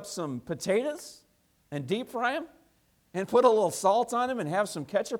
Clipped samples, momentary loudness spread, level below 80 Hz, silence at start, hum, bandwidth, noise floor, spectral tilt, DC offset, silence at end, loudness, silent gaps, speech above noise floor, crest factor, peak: under 0.1%; 15 LU; -72 dBFS; 0 s; none; 17.5 kHz; -67 dBFS; -4.5 dB/octave; under 0.1%; 0 s; -28 LUFS; none; 39 dB; 20 dB; -8 dBFS